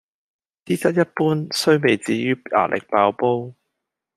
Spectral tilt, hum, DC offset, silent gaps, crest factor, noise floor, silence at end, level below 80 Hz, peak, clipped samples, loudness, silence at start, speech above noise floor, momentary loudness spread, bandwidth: -5.5 dB/octave; none; under 0.1%; none; 18 dB; -80 dBFS; 0.65 s; -64 dBFS; -2 dBFS; under 0.1%; -20 LUFS; 0.7 s; 61 dB; 5 LU; 14 kHz